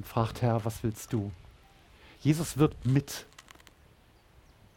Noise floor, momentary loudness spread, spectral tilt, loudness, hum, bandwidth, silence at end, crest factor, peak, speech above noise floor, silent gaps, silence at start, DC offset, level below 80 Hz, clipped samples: -60 dBFS; 16 LU; -6.5 dB/octave; -30 LUFS; none; 17 kHz; 1.35 s; 20 dB; -12 dBFS; 31 dB; none; 0 s; under 0.1%; -54 dBFS; under 0.1%